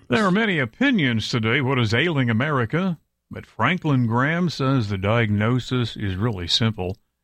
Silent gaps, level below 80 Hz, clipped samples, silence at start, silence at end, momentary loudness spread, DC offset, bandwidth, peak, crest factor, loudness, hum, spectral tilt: none; -52 dBFS; under 0.1%; 0.1 s; 0.3 s; 7 LU; under 0.1%; 11 kHz; -4 dBFS; 18 dB; -21 LUFS; none; -6 dB/octave